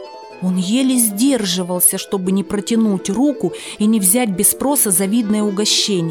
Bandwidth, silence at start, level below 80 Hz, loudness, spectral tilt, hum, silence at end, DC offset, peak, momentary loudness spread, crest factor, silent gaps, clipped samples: 19 kHz; 0 s; -54 dBFS; -15 LUFS; -3.5 dB/octave; none; 0 s; under 0.1%; 0 dBFS; 7 LU; 16 dB; none; under 0.1%